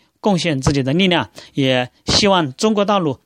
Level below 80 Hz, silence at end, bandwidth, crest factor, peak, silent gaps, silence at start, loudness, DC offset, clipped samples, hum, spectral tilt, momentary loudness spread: -40 dBFS; 0.1 s; 12.5 kHz; 16 dB; 0 dBFS; none; 0.25 s; -17 LUFS; under 0.1%; under 0.1%; none; -4.5 dB/octave; 6 LU